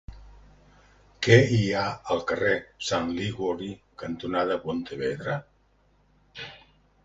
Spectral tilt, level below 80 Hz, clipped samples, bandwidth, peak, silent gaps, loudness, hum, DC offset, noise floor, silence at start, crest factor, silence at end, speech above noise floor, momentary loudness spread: -5.5 dB/octave; -52 dBFS; under 0.1%; 8 kHz; -4 dBFS; none; -26 LUFS; 50 Hz at -55 dBFS; under 0.1%; -64 dBFS; 0.1 s; 24 dB; 0.5 s; 38 dB; 20 LU